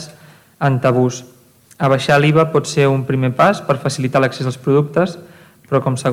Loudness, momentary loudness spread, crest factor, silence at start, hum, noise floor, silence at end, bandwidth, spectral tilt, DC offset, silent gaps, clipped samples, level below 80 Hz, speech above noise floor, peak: -16 LUFS; 8 LU; 16 dB; 0 s; none; -44 dBFS; 0 s; 14.5 kHz; -6 dB/octave; under 0.1%; none; under 0.1%; -56 dBFS; 29 dB; 0 dBFS